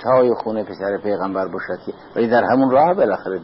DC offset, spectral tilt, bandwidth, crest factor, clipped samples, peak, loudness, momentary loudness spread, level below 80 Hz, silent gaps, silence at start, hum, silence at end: under 0.1%; -11.5 dB/octave; 5.8 kHz; 14 dB; under 0.1%; -4 dBFS; -18 LUFS; 12 LU; -58 dBFS; none; 0 s; none; 0 s